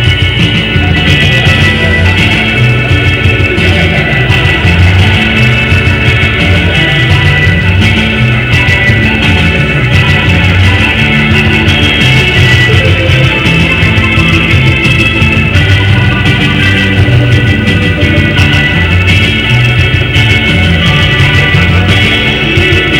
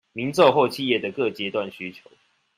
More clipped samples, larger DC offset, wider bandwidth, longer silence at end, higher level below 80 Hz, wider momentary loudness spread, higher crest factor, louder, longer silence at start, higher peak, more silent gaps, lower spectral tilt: first, 5% vs under 0.1%; neither; about the same, 15.5 kHz vs 16 kHz; second, 0 s vs 0.65 s; first, -20 dBFS vs -68 dBFS; second, 2 LU vs 16 LU; second, 6 dB vs 20 dB; first, -6 LUFS vs -22 LUFS; second, 0 s vs 0.15 s; first, 0 dBFS vs -4 dBFS; neither; about the same, -5.5 dB/octave vs -5 dB/octave